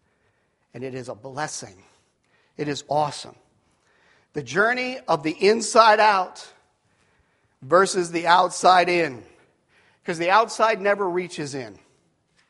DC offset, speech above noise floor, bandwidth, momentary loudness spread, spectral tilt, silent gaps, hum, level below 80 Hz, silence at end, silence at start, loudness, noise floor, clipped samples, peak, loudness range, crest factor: under 0.1%; 46 dB; 11.5 kHz; 19 LU; -3.5 dB/octave; none; none; -70 dBFS; 0.75 s; 0.75 s; -21 LUFS; -67 dBFS; under 0.1%; 0 dBFS; 11 LU; 22 dB